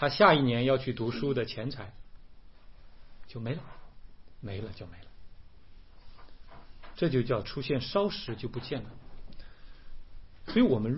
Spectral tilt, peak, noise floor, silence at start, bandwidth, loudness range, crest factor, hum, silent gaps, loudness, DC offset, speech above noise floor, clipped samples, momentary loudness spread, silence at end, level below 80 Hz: -10 dB/octave; -6 dBFS; -51 dBFS; 0 s; 5.8 kHz; 11 LU; 26 dB; none; none; -30 LUFS; 0.3%; 22 dB; under 0.1%; 22 LU; 0 s; -50 dBFS